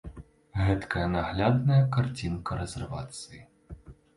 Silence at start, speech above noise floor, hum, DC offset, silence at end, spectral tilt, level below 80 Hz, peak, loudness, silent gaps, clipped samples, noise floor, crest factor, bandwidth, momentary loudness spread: 0.05 s; 20 dB; none; under 0.1%; 0.25 s; -7 dB/octave; -44 dBFS; -12 dBFS; -28 LUFS; none; under 0.1%; -48 dBFS; 18 dB; 11.5 kHz; 21 LU